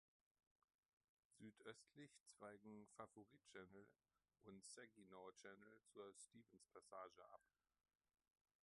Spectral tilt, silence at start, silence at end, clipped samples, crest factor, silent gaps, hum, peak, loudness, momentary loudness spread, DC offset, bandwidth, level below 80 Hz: -3.5 dB/octave; 1.3 s; 1.2 s; under 0.1%; 24 dB; 2.20-2.26 s; none; -42 dBFS; -64 LUFS; 7 LU; under 0.1%; 11.5 kHz; under -90 dBFS